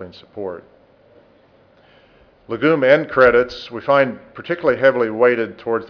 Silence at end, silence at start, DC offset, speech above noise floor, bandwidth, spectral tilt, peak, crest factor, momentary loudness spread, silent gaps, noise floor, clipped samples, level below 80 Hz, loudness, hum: 0.05 s; 0 s; under 0.1%; 35 dB; 5.4 kHz; -7 dB/octave; -2 dBFS; 18 dB; 17 LU; none; -52 dBFS; under 0.1%; -52 dBFS; -16 LUFS; none